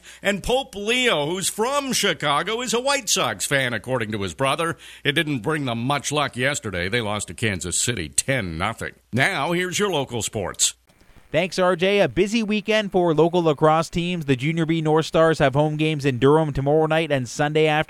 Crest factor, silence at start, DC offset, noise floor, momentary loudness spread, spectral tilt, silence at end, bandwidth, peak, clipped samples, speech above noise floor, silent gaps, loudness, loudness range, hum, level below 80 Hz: 20 dB; 0.05 s; under 0.1%; -52 dBFS; 6 LU; -4 dB/octave; 0.05 s; 14.5 kHz; -2 dBFS; under 0.1%; 30 dB; none; -21 LUFS; 3 LU; none; -48 dBFS